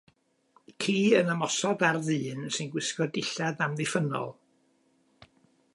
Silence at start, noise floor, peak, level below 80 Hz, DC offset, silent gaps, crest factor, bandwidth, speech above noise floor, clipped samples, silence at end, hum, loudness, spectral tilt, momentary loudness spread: 0.7 s; -68 dBFS; -8 dBFS; -76 dBFS; under 0.1%; none; 22 dB; 11.5 kHz; 40 dB; under 0.1%; 1.45 s; none; -28 LUFS; -4.5 dB/octave; 9 LU